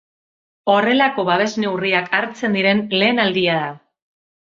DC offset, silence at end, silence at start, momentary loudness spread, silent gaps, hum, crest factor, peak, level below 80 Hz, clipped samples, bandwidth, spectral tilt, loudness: under 0.1%; 0.8 s; 0.65 s; 5 LU; none; none; 18 dB; 0 dBFS; -62 dBFS; under 0.1%; 7.6 kHz; -5 dB/octave; -17 LUFS